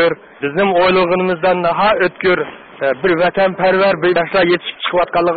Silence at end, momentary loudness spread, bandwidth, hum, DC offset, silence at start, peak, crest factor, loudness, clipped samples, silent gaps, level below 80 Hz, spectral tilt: 0 s; 6 LU; 4.8 kHz; none; 0.3%; 0 s; -4 dBFS; 10 dB; -14 LUFS; under 0.1%; none; -50 dBFS; -11 dB/octave